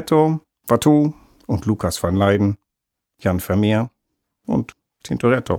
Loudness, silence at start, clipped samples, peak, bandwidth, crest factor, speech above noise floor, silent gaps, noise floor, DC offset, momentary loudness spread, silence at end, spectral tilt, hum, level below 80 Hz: -20 LUFS; 0 s; under 0.1%; -2 dBFS; 17.5 kHz; 16 dB; 63 dB; none; -81 dBFS; under 0.1%; 13 LU; 0 s; -6.5 dB/octave; none; -50 dBFS